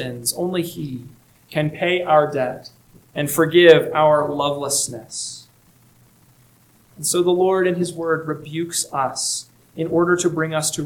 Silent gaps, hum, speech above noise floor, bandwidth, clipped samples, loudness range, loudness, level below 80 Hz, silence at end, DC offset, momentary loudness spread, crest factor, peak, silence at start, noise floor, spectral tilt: none; none; 35 dB; 19 kHz; under 0.1%; 6 LU; -19 LUFS; -60 dBFS; 0 s; under 0.1%; 14 LU; 20 dB; 0 dBFS; 0 s; -54 dBFS; -4 dB/octave